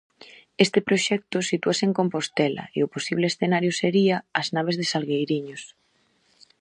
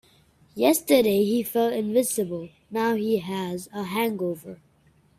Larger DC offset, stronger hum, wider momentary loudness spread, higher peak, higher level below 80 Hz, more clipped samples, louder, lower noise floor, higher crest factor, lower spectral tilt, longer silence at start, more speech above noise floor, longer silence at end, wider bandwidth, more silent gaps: neither; neither; second, 6 LU vs 13 LU; first, -2 dBFS vs -6 dBFS; second, -70 dBFS vs -64 dBFS; neither; about the same, -24 LUFS vs -24 LUFS; first, -66 dBFS vs -61 dBFS; about the same, 24 dB vs 20 dB; about the same, -4.5 dB/octave vs -4.5 dB/octave; about the same, 0.6 s vs 0.55 s; first, 42 dB vs 37 dB; first, 0.95 s vs 0.65 s; second, 10 kHz vs 16 kHz; neither